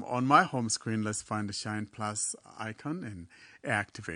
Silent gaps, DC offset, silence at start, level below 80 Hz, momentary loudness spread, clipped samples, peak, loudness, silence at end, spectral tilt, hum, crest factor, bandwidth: none; under 0.1%; 0 s; -70 dBFS; 17 LU; under 0.1%; -8 dBFS; -31 LUFS; 0 s; -4 dB/octave; none; 24 dB; 10 kHz